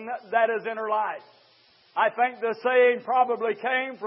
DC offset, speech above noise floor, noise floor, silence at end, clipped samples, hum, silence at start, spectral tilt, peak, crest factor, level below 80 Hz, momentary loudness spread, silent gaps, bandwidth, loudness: under 0.1%; 35 dB; -59 dBFS; 0 s; under 0.1%; none; 0 s; -7.5 dB/octave; -8 dBFS; 16 dB; under -90 dBFS; 8 LU; none; 5.8 kHz; -25 LUFS